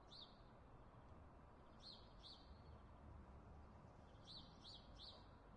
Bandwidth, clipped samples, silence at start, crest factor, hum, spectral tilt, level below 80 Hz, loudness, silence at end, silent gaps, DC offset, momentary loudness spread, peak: 9.4 kHz; under 0.1%; 0 s; 16 dB; none; -5.5 dB/octave; -68 dBFS; -63 LUFS; 0 s; none; under 0.1%; 6 LU; -48 dBFS